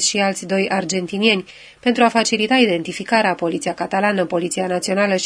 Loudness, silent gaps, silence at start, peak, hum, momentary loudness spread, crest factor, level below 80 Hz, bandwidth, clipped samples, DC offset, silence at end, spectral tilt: -18 LUFS; none; 0 s; 0 dBFS; none; 7 LU; 18 dB; -62 dBFS; 11 kHz; under 0.1%; under 0.1%; 0 s; -3.5 dB/octave